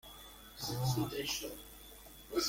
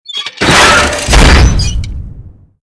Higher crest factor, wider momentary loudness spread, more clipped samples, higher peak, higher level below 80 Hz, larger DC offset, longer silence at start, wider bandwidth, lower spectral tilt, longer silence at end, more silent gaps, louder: first, 18 dB vs 8 dB; about the same, 17 LU vs 16 LU; second, under 0.1% vs 3%; second, -22 dBFS vs 0 dBFS; second, -60 dBFS vs -12 dBFS; neither; about the same, 0.05 s vs 0.1 s; first, 17 kHz vs 11 kHz; about the same, -4 dB/octave vs -3.5 dB/octave; second, 0 s vs 0.35 s; neither; second, -38 LUFS vs -7 LUFS